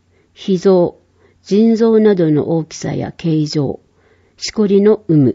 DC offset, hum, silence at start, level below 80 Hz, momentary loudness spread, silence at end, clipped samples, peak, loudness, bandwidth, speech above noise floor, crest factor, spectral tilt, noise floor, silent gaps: under 0.1%; none; 0.4 s; -52 dBFS; 12 LU; 0 s; under 0.1%; -2 dBFS; -14 LUFS; 7.8 kHz; 40 dB; 12 dB; -7 dB/octave; -53 dBFS; none